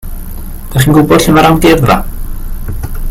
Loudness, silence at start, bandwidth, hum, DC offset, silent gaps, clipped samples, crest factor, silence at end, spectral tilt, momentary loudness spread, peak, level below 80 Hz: -8 LUFS; 0.05 s; 16.5 kHz; none; under 0.1%; none; 0.8%; 10 dB; 0 s; -5.5 dB/octave; 20 LU; 0 dBFS; -18 dBFS